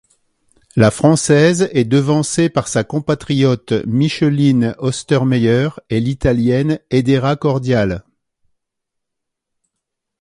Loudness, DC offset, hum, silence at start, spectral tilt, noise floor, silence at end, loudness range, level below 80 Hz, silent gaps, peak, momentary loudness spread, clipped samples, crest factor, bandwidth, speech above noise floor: -15 LUFS; under 0.1%; none; 0.75 s; -6 dB/octave; -78 dBFS; 2.2 s; 4 LU; -42 dBFS; none; 0 dBFS; 7 LU; under 0.1%; 16 dB; 11.5 kHz; 64 dB